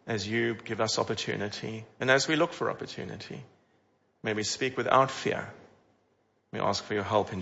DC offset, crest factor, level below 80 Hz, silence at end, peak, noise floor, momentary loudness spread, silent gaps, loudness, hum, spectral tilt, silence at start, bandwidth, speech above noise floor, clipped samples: under 0.1%; 22 dB; -68 dBFS; 0 s; -8 dBFS; -71 dBFS; 15 LU; none; -29 LUFS; none; -4 dB/octave; 0.05 s; 8 kHz; 41 dB; under 0.1%